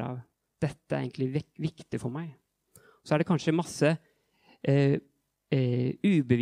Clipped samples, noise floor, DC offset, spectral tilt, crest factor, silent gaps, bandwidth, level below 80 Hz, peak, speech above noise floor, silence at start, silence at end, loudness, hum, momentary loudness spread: under 0.1%; -64 dBFS; under 0.1%; -7 dB/octave; 20 dB; none; 11.5 kHz; -66 dBFS; -10 dBFS; 37 dB; 0 s; 0 s; -29 LUFS; none; 11 LU